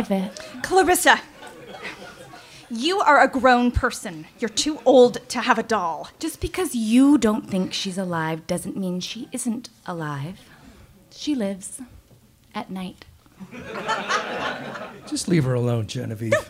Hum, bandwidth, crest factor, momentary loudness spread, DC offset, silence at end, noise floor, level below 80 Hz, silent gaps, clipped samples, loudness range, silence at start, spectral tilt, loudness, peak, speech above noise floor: none; 16 kHz; 22 dB; 20 LU; under 0.1%; 0 s; -54 dBFS; -46 dBFS; none; under 0.1%; 12 LU; 0 s; -4.5 dB/octave; -22 LUFS; -2 dBFS; 32 dB